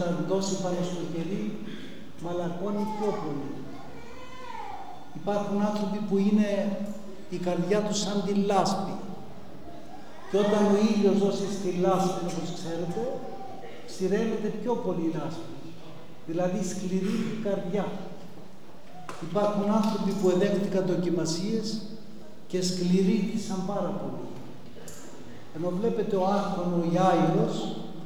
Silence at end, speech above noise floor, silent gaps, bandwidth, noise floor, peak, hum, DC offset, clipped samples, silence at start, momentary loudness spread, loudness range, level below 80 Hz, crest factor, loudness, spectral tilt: 0 s; 22 dB; none; 15 kHz; -49 dBFS; -12 dBFS; none; 2%; under 0.1%; 0 s; 20 LU; 6 LU; -66 dBFS; 18 dB; -28 LUFS; -6 dB/octave